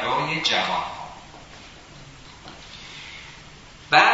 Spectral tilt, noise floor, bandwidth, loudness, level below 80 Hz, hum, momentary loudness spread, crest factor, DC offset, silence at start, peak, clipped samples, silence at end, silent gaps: -2.5 dB/octave; -45 dBFS; 8 kHz; -21 LUFS; -54 dBFS; none; 23 LU; 24 dB; under 0.1%; 0 s; -2 dBFS; under 0.1%; 0 s; none